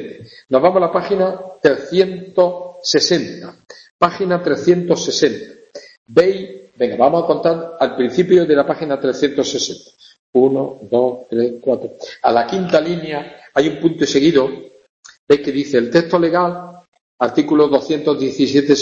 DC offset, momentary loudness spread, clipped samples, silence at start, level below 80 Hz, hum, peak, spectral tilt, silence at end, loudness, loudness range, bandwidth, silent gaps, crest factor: under 0.1%; 9 LU; under 0.1%; 0 s; -56 dBFS; none; 0 dBFS; -5 dB/octave; 0 s; -16 LUFS; 2 LU; 7.8 kHz; 3.90-3.99 s, 5.97-6.06 s, 10.19-10.33 s, 14.89-15.03 s, 15.19-15.27 s, 16.88-16.92 s, 17.01-17.18 s; 16 dB